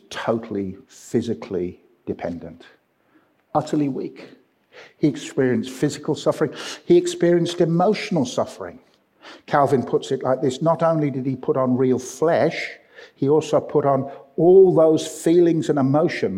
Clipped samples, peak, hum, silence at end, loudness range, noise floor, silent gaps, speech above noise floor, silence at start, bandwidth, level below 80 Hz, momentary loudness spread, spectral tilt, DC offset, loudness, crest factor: under 0.1%; -4 dBFS; none; 0 s; 10 LU; -60 dBFS; none; 40 dB; 0.1 s; 13.5 kHz; -64 dBFS; 14 LU; -6.5 dB/octave; under 0.1%; -20 LUFS; 18 dB